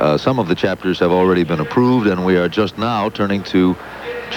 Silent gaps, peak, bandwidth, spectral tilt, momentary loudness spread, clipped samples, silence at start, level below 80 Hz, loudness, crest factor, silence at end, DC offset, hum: none; -2 dBFS; 19 kHz; -7 dB/octave; 5 LU; under 0.1%; 0 s; -48 dBFS; -16 LUFS; 14 dB; 0 s; under 0.1%; none